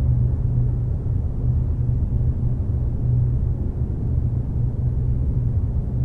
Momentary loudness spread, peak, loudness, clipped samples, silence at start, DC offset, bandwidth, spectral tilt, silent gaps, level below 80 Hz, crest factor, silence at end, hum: 3 LU; -8 dBFS; -23 LUFS; under 0.1%; 0 s; under 0.1%; 1.9 kHz; -12 dB/octave; none; -24 dBFS; 12 dB; 0 s; none